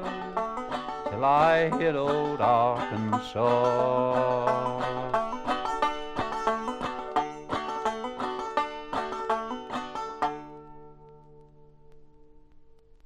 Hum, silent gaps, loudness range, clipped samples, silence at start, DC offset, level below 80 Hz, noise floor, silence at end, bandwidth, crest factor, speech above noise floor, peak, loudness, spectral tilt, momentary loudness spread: none; none; 10 LU; under 0.1%; 0 s; under 0.1%; -54 dBFS; -53 dBFS; 0.3 s; 11.5 kHz; 18 dB; 28 dB; -10 dBFS; -28 LUFS; -6 dB/octave; 10 LU